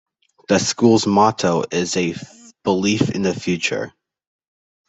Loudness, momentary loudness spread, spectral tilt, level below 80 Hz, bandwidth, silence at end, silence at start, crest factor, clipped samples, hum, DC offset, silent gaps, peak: -18 LUFS; 11 LU; -4.5 dB/octave; -58 dBFS; 8.4 kHz; 1 s; 0.5 s; 18 dB; under 0.1%; none; under 0.1%; none; -2 dBFS